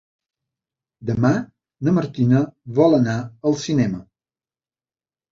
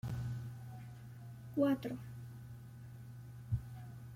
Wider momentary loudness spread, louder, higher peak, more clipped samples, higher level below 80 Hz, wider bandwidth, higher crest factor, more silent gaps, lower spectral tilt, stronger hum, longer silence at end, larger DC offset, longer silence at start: second, 10 LU vs 18 LU; first, -20 LUFS vs -42 LUFS; first, -4 dBFS vs -22 dBFS; neither; first, -54 dBFS vs -60 dBFS; second, 7.6 kHz vs 16.5 kHz; about the same, 18 dB vs 20 dB; neither; about the same, -7.5 dB/octave vs -8.5 dB/octave; neither; first, 1.3 s vs 0 s; neither; first, 1 s vs 0.05 s